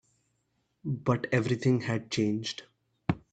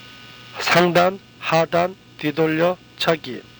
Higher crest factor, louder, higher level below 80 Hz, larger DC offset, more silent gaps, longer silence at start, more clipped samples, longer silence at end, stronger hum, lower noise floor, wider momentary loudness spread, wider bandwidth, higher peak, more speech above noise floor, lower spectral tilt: about the same, 20 dB vs 18 dB; second, -30 LUFS vs -20 LUFS; about the same, -62 dBFS vs -58 dBFS; neither; neither; first, 0.85 s vs 0 s; neither; about the same, 0.15 s vs 0.2 s; neither; first, -76 dBFS vs -42 dBFS; second, 10 LU vs 13 LU; second, 9 kHz vs over 20 kHz; second, -10 dBFS vs -2 dBFS; first, 47 dB vs 22 dB; about the same, -6 dB/octave vs -5 dB/octave